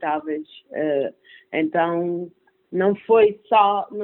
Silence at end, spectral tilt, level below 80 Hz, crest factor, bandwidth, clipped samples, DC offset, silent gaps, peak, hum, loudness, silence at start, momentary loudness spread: 0 s; -10.5 dB/octave; -68 dBFS; 16 dB; 4.1 kHz; under 0.1%; under 0.1%; none; -4 dBFS; none; -21 LUFS; 0 s; 14 LU